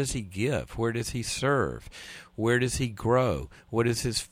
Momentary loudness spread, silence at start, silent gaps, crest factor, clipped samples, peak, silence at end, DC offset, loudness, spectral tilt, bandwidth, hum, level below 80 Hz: 11 LU; 0 s; none; 16 dB; under 0.1%; -12 dBFS; 0.05 s; under 0.1%; -28 LUFS; -5 dB/octave; 16 kHz; none; -46 dBFS